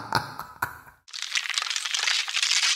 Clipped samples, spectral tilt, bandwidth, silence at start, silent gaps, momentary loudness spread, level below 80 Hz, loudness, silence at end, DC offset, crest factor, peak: under 0.1%; 0.5 dB/octave; 16 kHz; 0 s; none; 13 LU; -62 dBFS; -25 LUFS; 0 s; under 0.1%; 24 dB; -4 dBFS